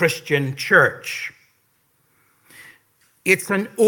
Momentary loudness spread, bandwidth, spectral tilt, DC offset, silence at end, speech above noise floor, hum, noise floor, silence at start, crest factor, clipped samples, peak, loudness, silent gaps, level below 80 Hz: 13 LU; 17.5 kHz; -4.5 dB/octave; under 0.1%; 0 s; 45 dB; none; -64 dBFS; 0 s; 22 dB; under 0.1%; 0 dBFS; -19 LUFS; none; -70 dBFS